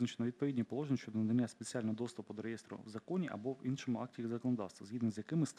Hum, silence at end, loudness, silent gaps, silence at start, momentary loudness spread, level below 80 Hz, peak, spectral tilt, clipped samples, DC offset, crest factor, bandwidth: none; 0.05 s; -40 LUFS; none; 0 s; 9 LU; -82 dBFS; -24 dBFS; -6.5 dB/octave; under 0.1%; under 0.1%; 14 dB; 11 kHz